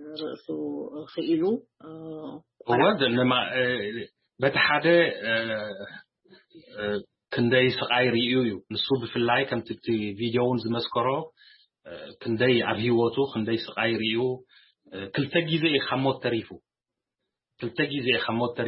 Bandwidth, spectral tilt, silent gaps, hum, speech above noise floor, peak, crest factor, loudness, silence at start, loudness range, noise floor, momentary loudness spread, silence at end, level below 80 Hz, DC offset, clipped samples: 5.8 kHz; -10 dB/octave; none; none; 63 dB; -6 dBFS; 20 dB; -25 LUFS; 0 s; 4 LU; -89 dBFS; 17 LU; 0 s; -66 dBFS; under 0.1%; under 0.1%